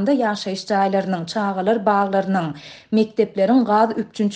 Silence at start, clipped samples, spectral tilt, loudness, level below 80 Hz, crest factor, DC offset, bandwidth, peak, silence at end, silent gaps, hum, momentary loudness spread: 0 s; under 0.1%; -6.5 dB/octave; -20 LUFS; -64 dBFS; 16 dB; under 0.1%; 9.2 kHz; -4 dBFS; 0 s; none; none; 6 LU